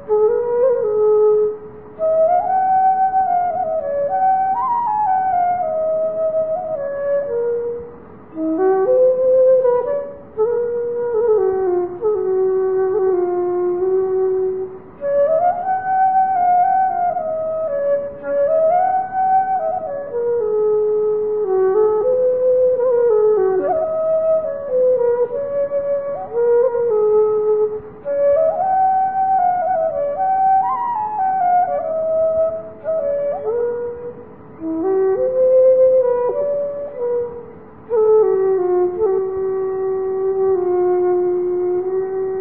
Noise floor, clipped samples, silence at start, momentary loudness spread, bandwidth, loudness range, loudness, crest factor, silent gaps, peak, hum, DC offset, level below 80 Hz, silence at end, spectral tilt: -38 dBFS; under 0.1%; 0 s; 8 LU; 3 kHz; 3 LU; -17 LUFS; 12 dB; none; -6 dBFS; none; 0.5%; -56 dBFS; 0 s; -12.5 dB/octave